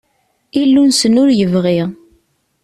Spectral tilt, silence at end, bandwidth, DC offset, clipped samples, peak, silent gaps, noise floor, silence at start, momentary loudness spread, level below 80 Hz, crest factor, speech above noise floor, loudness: -5 dB/octave; 0.7 s; 13 kHz; under 0.1%; under 0.1%; -2 dBFS; none; -62 dBFS; 0.55 s; 9 LU; -52 dBFS; 12 dB; 51 dB; -12 LUFS